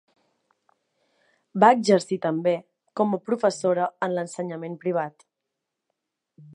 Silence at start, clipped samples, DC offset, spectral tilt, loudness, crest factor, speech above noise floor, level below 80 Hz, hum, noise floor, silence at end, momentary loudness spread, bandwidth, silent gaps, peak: 1.55 s; under 0.1%; under 0.1%; -5.5 dB/octave; -24 LUFS; 24 dB; 60 dB; -80 dBFS; none; -83 dBFS; 0.15 s; 14 LU; 11 kHz; none; -2 dBFS